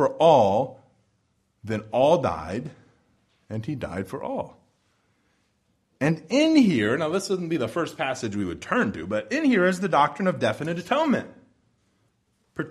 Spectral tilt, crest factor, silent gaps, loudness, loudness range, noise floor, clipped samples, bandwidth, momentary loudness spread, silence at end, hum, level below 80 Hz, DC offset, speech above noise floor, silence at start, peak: -6 dB/octave; 20 dB; none; -24 LUFS; 9 LU; -70 dBFS; under 0.1%; 13 kHz; 15 LU; 0 s; none; -58 dBFS; under 0.1%; 47 dB; 0 s; -4 dBFS